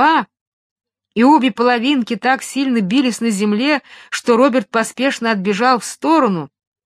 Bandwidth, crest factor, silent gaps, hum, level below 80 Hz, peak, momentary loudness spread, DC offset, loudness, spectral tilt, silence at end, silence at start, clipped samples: 14 kHz; 16 dB; 0.41-0.76 s; none; -68 dBFS; 0 dBFS; 8 LU; under 0.1%; -16 LUFS; -4.5 dB/octave; 0.4 s; 0 s; under 0.1%